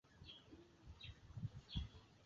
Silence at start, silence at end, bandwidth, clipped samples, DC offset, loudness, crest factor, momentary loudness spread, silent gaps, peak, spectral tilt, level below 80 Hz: 0.05 s; 0 s; 7.4 kHz; under 0.1%; under 0.1%; -55 LUFS; 24 dB; 14 LU; none; -32 dBFS; -5 dB/octave; -60 dBFS